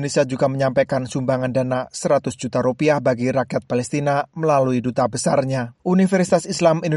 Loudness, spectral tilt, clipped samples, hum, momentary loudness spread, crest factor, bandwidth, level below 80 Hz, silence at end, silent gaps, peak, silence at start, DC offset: -20 LUFS; -6 dB/octave; under 0.1%; none; 5 LU; 16 dB; 11.5 kHz; -56 dBFS; 0 s; none; -4 dBFS; 0 s; under 0.1%